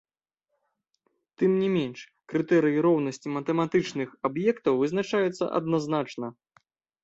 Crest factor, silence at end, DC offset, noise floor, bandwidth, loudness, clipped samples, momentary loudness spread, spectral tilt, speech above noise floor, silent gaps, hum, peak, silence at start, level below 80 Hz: 16 dB; 0.7 s; under 0.1%; -83 dBFS; 8 kHz; -26 LUFS; under 0.1%; 9 LU; -6.5 dB/octave; 57 dB; none; none; -12 dBFS; 1.4 s; -70 dBFS